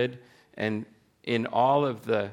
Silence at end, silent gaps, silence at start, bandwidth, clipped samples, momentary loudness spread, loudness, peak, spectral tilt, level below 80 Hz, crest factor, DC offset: 0 s; none; 0 s; 16.5 kHz; under 0.1%; 14 LU; -27 LUFS; -10 dBFS; -7 dB/octave; -74 dBFS; 18 dB; under 0.1%